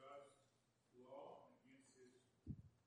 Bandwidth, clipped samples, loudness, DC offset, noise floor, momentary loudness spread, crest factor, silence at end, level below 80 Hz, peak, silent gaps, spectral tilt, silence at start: 10 kHz; under 0.1%; -61 LUFS; under 0.1%; -82 dBFS; 8 LU; 22 dB; 0 s; -76 dBFS; -40 dBFS; none; -6.5 dB/octave; 0 s